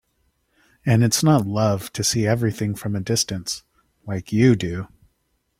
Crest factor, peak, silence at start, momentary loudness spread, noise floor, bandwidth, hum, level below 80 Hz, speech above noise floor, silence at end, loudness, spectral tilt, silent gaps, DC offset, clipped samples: 18 dB; -4 dBFS; 0.85 s; 13 LU; -70 dBFS; 16.5 kHz; none; -52 dBFS; 50 dB; 0.75 s; -21 LUFS; -5 dB/octave; none; under 0.1%; under 0.1%